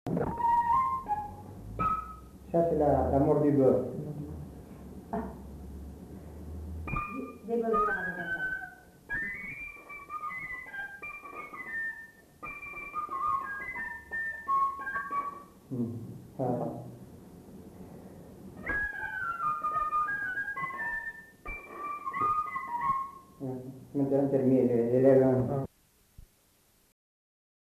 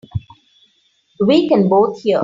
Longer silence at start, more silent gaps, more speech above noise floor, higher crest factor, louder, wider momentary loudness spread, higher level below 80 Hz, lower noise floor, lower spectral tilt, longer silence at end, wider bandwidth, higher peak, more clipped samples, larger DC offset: about the same, 0.05 s vs 0.15 s; neither; second, 40 dB vs 46 dB; first, 20 dB vs 14 dB; second, -31 LUFS vs -14 LUFS; first, 20 LU vs 15 LU; about the same, -52 dBFS vs -48 dBFS; first, -67 dBFS vs -60 dBFS; about the same, -8.5 dB/octave vs -8 dB/octave; first, 1.45 s vs 0 s; first, 14 kHz vs 7.6 kHz; second, -12 dBFS vs -2 dBFS; neither; neither